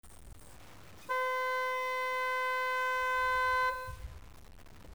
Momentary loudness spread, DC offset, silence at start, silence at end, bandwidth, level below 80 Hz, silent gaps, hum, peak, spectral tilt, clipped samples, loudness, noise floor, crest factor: 14 LU; 0.2%; 0 s; 0 s; over 20 kHz; -56 dBFS; none; none; -24 dBFS; -2 dB/octave; under 0.1%; -32 LUFS; -54 dBFS; 12 dB